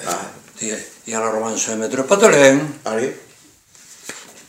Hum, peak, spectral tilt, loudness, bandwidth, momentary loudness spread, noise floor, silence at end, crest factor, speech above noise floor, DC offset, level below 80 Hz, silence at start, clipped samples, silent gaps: none; 0 dBFS; -3.5 dB/octave; -17 LUFS; 16 kHz; 22 LU; -49 dBFS; 0.1 s; 18 dB; 32 dB; under 0.1%; -66 dBFS; 0 s; under 0.1%; none